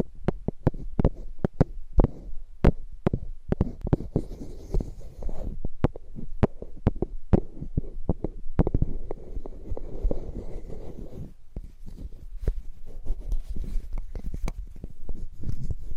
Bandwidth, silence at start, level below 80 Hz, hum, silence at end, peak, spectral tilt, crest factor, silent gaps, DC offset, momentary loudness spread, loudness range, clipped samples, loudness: 6.4 kHz; 0 s; -30 dBFS; none; 0 s; -6 dBFS; -9.5 dB/octave; 20 dB; none; under 0.1%; 17 LU; 10 LU; under 0.1%; -31 LUFS